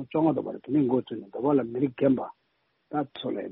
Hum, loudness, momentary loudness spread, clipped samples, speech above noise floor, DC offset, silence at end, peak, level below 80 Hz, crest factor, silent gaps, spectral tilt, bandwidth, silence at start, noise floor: none; -27 LUFS; 9 LU; under 0.1%; 46 dB; under 0.1%; 0 s; -10 dBFS; -68 dBFS; 18 dB; none; -7 dB/octave; 4 kHz; 0 s; -73 dBFS